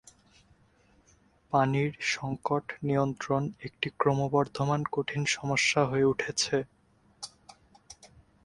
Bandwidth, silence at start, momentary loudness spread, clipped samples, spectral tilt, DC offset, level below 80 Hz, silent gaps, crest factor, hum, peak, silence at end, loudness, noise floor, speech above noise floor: 11.5 kHz; 1.5 s; 10 LU; under 0.1%; -4.5 dB/octave; under 0.1%; -62 dBFS; none; 20 dB; none; -10 dBFS; 0.4 s; -29 LUFS; -64 dBFS; 35 dB